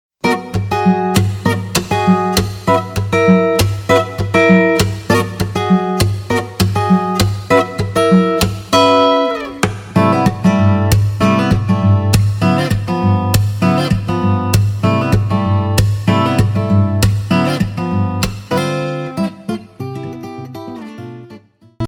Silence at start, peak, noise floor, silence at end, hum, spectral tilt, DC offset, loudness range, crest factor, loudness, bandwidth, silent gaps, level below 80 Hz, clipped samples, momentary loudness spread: 0.25 s; 0 dBFS; -40 dBFS; 0 s; none; -6 dB/octave; under 0.1%; 5 LU; 14 dB; -14 LUFS; 17.5 kHz; none; -34 dBFS; under 0.1%; 9 LU